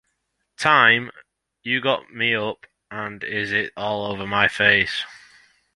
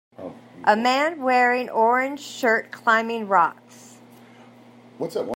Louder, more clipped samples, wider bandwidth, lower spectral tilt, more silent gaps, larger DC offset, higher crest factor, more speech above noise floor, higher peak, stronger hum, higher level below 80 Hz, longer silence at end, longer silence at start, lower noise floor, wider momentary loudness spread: about the same, -20 LUFS vs -21 LUFS; neither; second, 11.5 kHz vs 16 kHz; about the same, -4 dB/octave vs -4 dB/octave; neither; neither; about the same, 22 dB vs 20 dB; first, 53 dB vs 27 dB; about the same, -2 dBFS vs -2 dBFS; neither; first, -58 dBFS vs -82 dBFS; first, 0.6 s vs 0 s; first, 0.6 s vs 0.2 s; first, -74 dBFS vs -48 dBFS; first, 18 LU vs 12 LU